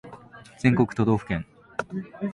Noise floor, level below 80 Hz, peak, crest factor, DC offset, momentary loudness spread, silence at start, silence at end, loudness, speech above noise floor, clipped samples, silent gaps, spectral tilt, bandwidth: -47 dBFS; -50 dBFS; -8 dBFS; 18 dB; under 0.1%; 16 LU; 0.05 s; 0 s; -26 LUFS; 22 dB; under 0.1%; none; -8 dB/octave; 11 kHz